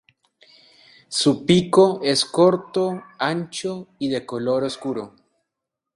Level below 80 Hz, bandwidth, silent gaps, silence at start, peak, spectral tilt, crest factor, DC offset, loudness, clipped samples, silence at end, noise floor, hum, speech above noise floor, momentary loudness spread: -62 dBFS; 11.5 kHz; none; 1.1 s; -2 dBFS; -5 dB/octave; 20 dB; under 0.1%; -21 LUFS; under 0.1%; 0.85 s; -83 dBFS; none; 63 dB; 12 LU